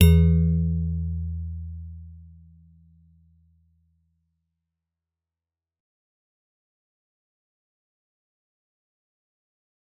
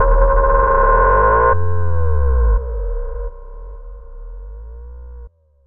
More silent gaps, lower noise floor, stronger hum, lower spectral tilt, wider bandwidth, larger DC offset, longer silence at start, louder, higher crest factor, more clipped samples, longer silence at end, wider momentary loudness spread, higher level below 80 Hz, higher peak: neither; first, under -90 dBFS vs -39 dBFS; neither; second, -8.5 dB/octave vs -12 dB/octave; first, 4 kHz vs 2.7 kHz; neither; about the same, 0 s vs 0 s; second, -24 LUFS vs -16 LUFS; first, 24 dB vs 14 dB; neither; first, 7.8 s vs 0 s; about the same, 23 LU vs 24 LU; second, -38 dBFS vs -20 dBFS; second, -4 dBFS vs 0 dBFS